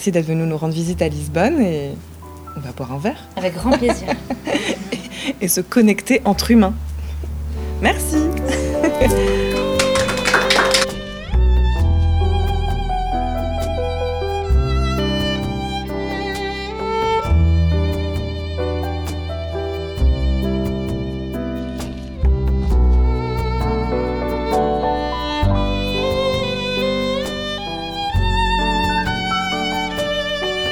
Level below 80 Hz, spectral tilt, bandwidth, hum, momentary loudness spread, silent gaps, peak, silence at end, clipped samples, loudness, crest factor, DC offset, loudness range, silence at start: -24 dBFS; -5 dB/octave; 18 kHz; none; 10 LU; none; 0 dBFS; 0 s; under 0.1%; -19 LUFS; 18 dB; 0.2%; 5 LU; 0 s